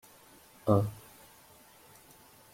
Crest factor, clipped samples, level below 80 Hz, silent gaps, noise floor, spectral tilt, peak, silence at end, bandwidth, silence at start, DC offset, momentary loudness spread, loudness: 26 dB; under 0.1%; -66 dBFS; none; -58 dBFS; -8 dB/octave; -10 dBFS; 1.55 s; 16.5 kHz; 0.65 s; under 0.1%; 27 LU; -31 LUFS